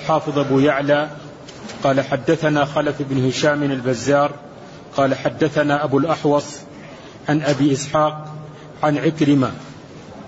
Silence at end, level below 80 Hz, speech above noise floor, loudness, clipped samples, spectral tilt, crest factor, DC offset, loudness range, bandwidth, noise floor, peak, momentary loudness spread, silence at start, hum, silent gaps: 0 s; -54 dBFS; 20 dB; -19 LUFS; under 0.1%; -6 dB/octave; 16 dB; under 0.1%; 1 LU; 8 kHz; -38 dBFS; -4 dBFS; 20 LU; 0 s; none; none